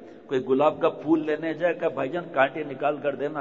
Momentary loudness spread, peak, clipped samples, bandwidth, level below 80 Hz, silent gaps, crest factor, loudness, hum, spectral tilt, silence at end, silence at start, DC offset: 6 LU; -6 dBFS; under 0.1%; 7.4 kHz; -70 dBFS; none; 18 dB; -25 LUFS; none; -7.5 dB/octave; 0 s; 0 s; 0.1%